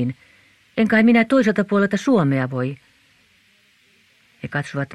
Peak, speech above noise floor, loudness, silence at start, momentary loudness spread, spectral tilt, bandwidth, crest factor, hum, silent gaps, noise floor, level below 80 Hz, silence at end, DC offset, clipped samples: -4 dBFS; 40 dB; -19 LUFS; 0 s; 15 LU; -7 dB/octave; 10.5 kHz; 16 dB; none; none; -58 dBFS; -62 dBFS; 0 s; under 0.1%; under 0.1%